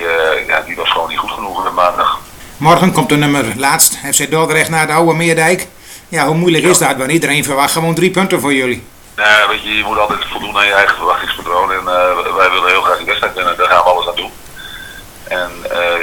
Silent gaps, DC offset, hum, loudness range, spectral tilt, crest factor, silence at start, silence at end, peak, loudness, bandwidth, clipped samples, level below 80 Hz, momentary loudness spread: none; under 0.1%; none; 2 LU; -3 dB/octave; 12 dB; 0 s; 0 s; 0 dBFS; -12 LUFS; over 20 kHz; 0.1%; -42 dBFS; 11 LU